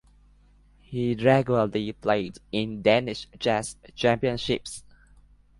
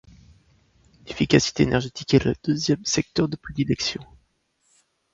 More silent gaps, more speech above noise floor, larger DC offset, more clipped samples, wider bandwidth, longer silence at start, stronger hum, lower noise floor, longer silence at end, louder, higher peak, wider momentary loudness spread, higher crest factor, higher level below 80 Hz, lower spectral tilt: neither; second, 32 dB vs 46 dB; neither; neither; first, 11.5 kHz vs 7.8 kHz; second, 0.9 s vs 1.05 s; first, 50 Hz at -55 dBFS vs none; second, -57 dBFS vs -68 dBFS; second, 0.8 s vs 1.1 s; about the same, -25 LUFS vs -23 LUFS; second, -6 dBFS vs -2 dBFS; first, 13 LU vs 8 LU; about the same, 20 dB vs 22 dB; second, -54 dBFS vs -46 dBFS; about the same, -5.5 dB/octave vs -5 dB/octave